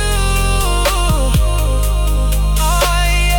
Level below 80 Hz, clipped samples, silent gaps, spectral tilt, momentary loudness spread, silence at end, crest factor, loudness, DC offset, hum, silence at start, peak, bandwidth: -14 dBFS; under 0.1%; none; -4 dB/octave; 3 LU; 0 s; 10 dB; -15 LUFS; under 0.1%; none; 0 s; -4 dBFS; 19 kHz